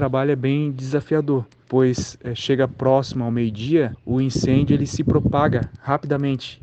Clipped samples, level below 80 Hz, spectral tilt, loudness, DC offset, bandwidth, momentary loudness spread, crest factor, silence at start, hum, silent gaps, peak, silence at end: under 0.1%; -44 dBFS; -7 dB/octave; -21 LUFS; under 0.1%; 8.4 kHz; 6 LU; 16 dB; 0 s; none; none; -4 dBFS; 0.05 s